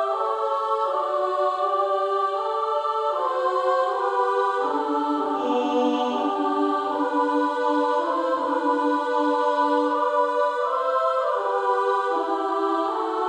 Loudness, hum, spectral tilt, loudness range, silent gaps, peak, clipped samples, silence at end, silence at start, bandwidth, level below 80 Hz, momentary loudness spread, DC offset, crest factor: -23 LUFS; none; -3.5 dB/octave; 1 LU; none; -10 dBFS; under 0.1%; 0 s; 0 s; 10.5 kHz; -74 dBFS; 2 LU; under 0.1%; 12 dB